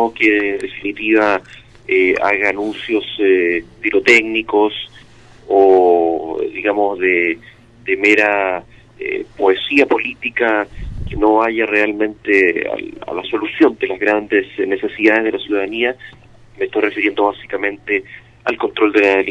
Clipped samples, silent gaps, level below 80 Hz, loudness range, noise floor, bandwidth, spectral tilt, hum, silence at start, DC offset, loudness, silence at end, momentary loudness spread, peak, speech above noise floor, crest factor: under 0.1%; none; -42 dBFS; 3 LU; -42 dBFS; 9.6 kHz; -5 dB/octave; none; 0 s; under 0.1%; -15 LUFS; 0 s; 12 LU; -2 dBFS; 27 dB; 16 dB